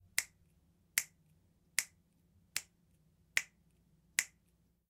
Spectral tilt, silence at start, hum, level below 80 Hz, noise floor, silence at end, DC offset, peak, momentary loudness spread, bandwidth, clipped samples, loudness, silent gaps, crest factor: 2 dB/octave; 0.15 s; none; -78 dBFS; -74 dBFS; 0.65 s; under 0.1%; -8 dBFS; 13 LU; 16 kHz; under 0.1%; -38 LUFS; none; 36 dB